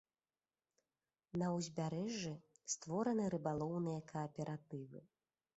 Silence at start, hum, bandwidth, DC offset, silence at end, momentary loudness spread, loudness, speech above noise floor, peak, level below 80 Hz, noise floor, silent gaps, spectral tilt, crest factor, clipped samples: 1.35 s; none; 8 kHz; under 0.1%; 0.55 s; 12 LU; -43 LUFS; over 48 dB; -26 dBFS; -76 dBFS; under -90 dBFS; none; -7 dB/octave; 18 dB; under 0.1%